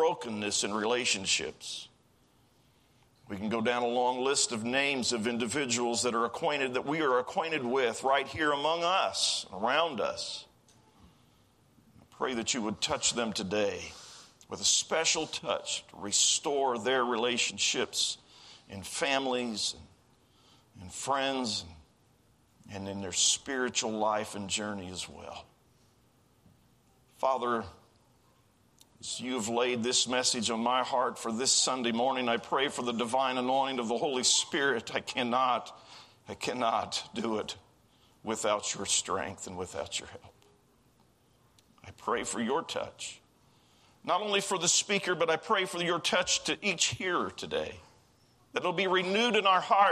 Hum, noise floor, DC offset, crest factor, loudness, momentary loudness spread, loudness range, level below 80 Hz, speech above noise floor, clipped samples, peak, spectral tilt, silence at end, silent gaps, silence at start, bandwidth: none; -66 dBFS; under 0.1%; 20 dB; -30 LUFS; 14 LU; 9 LU; -70 dBFS; 35 dB; under 0.1%; -12 dBFS; -2 dB/octave; 0 s; none; 0 s; 14.5 kHz